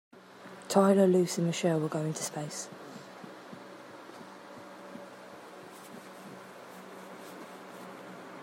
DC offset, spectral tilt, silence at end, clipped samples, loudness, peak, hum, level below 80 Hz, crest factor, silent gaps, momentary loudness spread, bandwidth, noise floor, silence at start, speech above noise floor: under 0.1%; -5.5 dB/octave; 0 s; under 0.1%; -29 LUFS; -10 dBFS; none; -82 dBFS; 24 dB; none; 23 LU; 16 kHz; -50 dBFS; 0.15 s; 23 dB